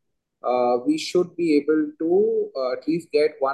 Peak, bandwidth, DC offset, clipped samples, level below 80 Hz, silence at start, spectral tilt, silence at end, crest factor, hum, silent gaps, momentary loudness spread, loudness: -8 dBFS; 12.5 kHz; under 0.1%; under 0.1%; -74 dBFS; 0.45 s; -5.5 dB/octave; 0 s; 14 dB; none; none; 6 LU; -22 LUFS